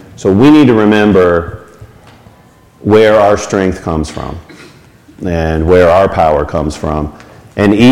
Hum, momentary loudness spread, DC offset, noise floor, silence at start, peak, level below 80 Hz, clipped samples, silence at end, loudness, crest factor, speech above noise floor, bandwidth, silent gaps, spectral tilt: none; 17 LU; under 0.1%; -42 dBFS; 0.2 s; 0 dBFS; -30 dBFS; under 0.1%; 0 s; -10 LUFS; 10 dB; 34 dB; 12.5 kHz; none; -6.5 dB/octave